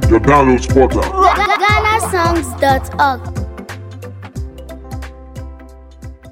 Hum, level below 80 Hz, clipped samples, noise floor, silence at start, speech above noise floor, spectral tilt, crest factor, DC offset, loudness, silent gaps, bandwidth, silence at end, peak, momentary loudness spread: none; -26 dBFS; under 0.1%; -36 dBFS; 0 s; 24 dB; -5.5 dB/octave; 14 dB; under 0.1%; -13 LUFS; none; 17 kHz; 0 s; 0 dBFS; 21 LU